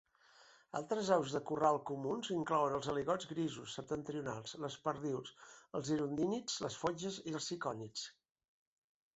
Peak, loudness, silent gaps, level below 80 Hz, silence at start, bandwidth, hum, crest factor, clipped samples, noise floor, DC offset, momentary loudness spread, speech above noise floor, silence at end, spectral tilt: -18 dBFS; -39 LUFS; none; -74 dBFS; 0.4 s; 8 kHz; none; 22 dB; under 0.1%; -66 dBFS; under 0.1%; 11 LU; 27 dB; 1.05 s; -4.5 dB/octave